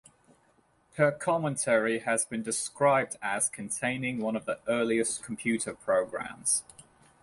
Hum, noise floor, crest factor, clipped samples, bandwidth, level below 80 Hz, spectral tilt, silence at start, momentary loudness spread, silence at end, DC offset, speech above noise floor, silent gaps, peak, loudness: none; -67 dBFS; 20 dB; under 0.1%; 11.5 kHz; -68 dBFS; -3.5 dB/octave; 0.95 s; 6 LU; 0.4 s; under 0.1%; 38 dB; none; -10 dBFS; -29 LUFS